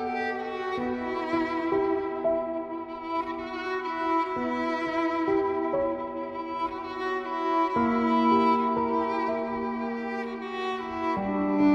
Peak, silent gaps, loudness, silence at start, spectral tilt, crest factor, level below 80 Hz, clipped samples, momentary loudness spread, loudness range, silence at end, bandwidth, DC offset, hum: -12 dBFS; none; -28 LUFS; 0 s; -7 dB/octave; 16 dB; -60 dBFS; under 0.1%; 9 LU; 3 LU; 0 s; 8 kHz; under 0.1%; none